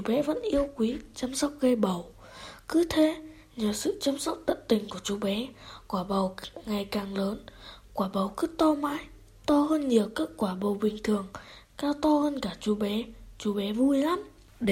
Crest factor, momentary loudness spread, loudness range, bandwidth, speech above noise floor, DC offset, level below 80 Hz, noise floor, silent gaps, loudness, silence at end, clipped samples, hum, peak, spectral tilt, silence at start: 18 dB; 16 LU; 3 LU; 16 kHz; 19 dB; under 0.1%; -54 dBFS; -47 dBFS; none; -29 LUFS; 0 s; under 0.1%; none; -10 dBFS; -5 dB/octave; 0 s